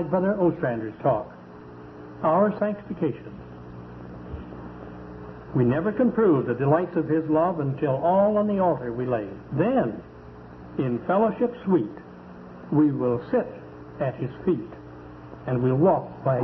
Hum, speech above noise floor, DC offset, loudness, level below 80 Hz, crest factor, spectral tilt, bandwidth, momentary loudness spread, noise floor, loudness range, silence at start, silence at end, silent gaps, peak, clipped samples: none; 20 dB; under 0.1%; -24 LUFS; -52 dBFS; 16 dB; -11.5 dB/octave; 5.6 kHz; 21 LU; -43 dBFS; 6 LU; 0 s; 0 s; none; -8 dBFS; under 0.1%